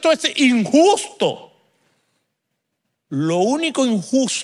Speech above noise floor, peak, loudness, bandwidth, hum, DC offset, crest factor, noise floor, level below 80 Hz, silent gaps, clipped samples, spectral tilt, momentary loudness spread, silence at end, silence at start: 59 dB; -2 dBFS; -17 LUFS; 12 kHz; none; under 0.1%; 16 dB; -76 dBFS; -74 dBFS; none; under 0.1%; -4 dB/octave; 9 LU; 0 s; 0 s